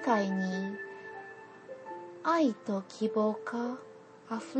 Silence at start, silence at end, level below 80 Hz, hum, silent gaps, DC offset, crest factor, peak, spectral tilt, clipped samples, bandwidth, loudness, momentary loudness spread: 0 s; 0 s; -84 dBFS; none; none; under 0.1%; 20 dB; -14 dBFS; -6.5 dB/octave; under 0.1%; 8.8 kHz; -33 LUFS; 19 LU